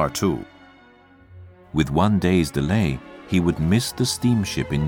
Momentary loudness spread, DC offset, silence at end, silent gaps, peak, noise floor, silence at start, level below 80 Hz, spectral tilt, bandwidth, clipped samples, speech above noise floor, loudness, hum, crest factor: 8 LU; under 0.1%; 0 s; none; -4 dBFS; -51 dBFS; 0 s; -40 dBFS; -5.5 dB/octave; 19 kHz; under 0.1%; 30 dB; -22 LUFS; none; 18 dB